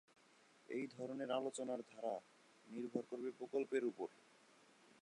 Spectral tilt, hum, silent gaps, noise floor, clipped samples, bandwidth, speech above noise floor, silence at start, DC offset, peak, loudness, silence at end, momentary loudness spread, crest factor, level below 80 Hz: -5 dB/octave; none; none; -71 dBFS; under 0.1%; 11 kHz; 26 dB; 0.7 s; under 0.1%; -26 dBFS; -46 LUFS; 0.9 s; 9 LU; 20 dB; under -90 dBFS